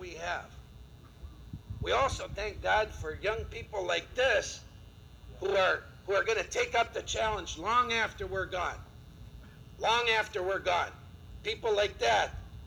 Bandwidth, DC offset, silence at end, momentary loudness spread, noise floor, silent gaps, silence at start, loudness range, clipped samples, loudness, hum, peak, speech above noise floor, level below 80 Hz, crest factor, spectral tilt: over 20 kHz; under 0.1%; 0 s; 23 LU; -52 dBFS; none; 0 s; 3 LU; under 0.1%; -31 LUFS; none; -16 dBFS; 21 dB; -50 dBFS; 18 dB; -3 dB/octave